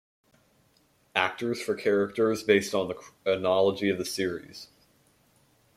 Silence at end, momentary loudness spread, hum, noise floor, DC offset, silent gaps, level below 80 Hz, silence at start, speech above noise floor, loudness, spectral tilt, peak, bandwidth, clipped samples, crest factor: 1.1 s; 10 LU; none; -66 dBFS; under 0.1%; none; -70 dBFS; 1.15 s; 39 dB; -27 LUFS; -4.5 dB/octave; -6 dBFS; 15.5 kHz; under 0.1%; 22 dB